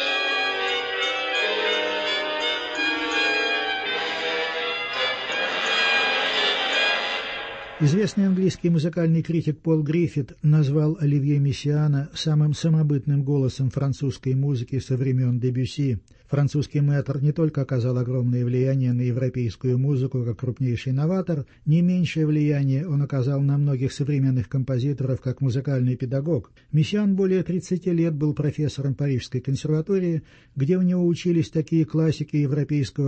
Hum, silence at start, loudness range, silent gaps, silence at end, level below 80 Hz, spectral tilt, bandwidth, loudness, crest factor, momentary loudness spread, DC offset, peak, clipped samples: none; 0 s; 2 LU; none; 0 s; -54 dBFS; -6.5 dB/octave; 8.6 kHz; -23 LUFS; 14 dB; 6 LU; under 0.1%; -10 dBFS; under 0.1%